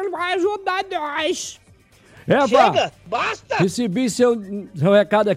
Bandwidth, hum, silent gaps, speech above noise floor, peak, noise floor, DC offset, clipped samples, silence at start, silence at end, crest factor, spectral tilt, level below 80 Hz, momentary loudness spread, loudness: 14.5 kHz; none; none; 32 dB; -4 dBFS; -51 dBFS; under 0.1%; under 0.1%; 0 s; 0 s; 16 dB; -5 dB/octave; -58 dBFS; 10 LU; -19 LUFS